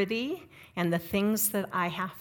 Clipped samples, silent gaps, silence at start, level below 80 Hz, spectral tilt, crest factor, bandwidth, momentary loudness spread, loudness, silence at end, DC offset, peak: under 0.1%; none; 0 s; -64 dBFS; -4.5 dB/octave; 16 dB; 18 kHz; 11 LU; -29 LUFS; 0 s; under 0.1%; -14 dBFS